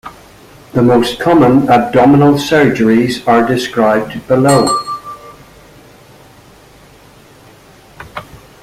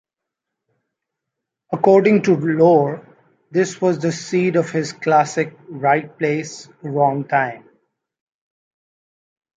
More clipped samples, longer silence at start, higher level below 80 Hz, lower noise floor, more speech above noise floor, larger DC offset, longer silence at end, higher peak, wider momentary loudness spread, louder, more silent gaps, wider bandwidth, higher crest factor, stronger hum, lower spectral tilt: neither; second, 0.05 s vs 1.7 s; first, -44 dBFS vs -66 dBFS; second, -41 dBFS vs -83 dBFS; second, 31 dB vs 66 dB; neither; second, 0.25 s vs 2 s; about the same, 0 dBFS vs -2 dBFS; first, 20 LU vs 12 LU; first, -11 LUFS vs -18 LUFS; neither; first, 15.5 kHz vs 9.2 kHz; second, 12 dB vs 18 dB; neither; about the same, -6 dB/octave vs -6.5 dB/octave